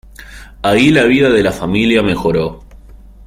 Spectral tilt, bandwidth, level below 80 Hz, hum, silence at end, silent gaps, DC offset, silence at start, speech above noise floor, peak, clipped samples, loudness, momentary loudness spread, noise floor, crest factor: -6 dB/octave; 16 kHz; -36 dBFS; none; 0.3 s; none; under 0.1%; 0.2 s; 25 dB; 0 dBFS; under 0.1%; -12 LUFS; 9 LU; -37 dBFS; 14 dB